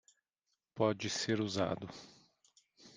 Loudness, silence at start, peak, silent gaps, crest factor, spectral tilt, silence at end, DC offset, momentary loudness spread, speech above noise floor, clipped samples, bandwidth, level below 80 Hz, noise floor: -36 LUFS; 0.75 s; -16 dBFS; none; 22 dB; -4.5 dB/octave; 0.05 s; under 0.1%; 17 LU; 50 dB; under 0.1%; 10 kHz; -74 dBFS; -86 dBFS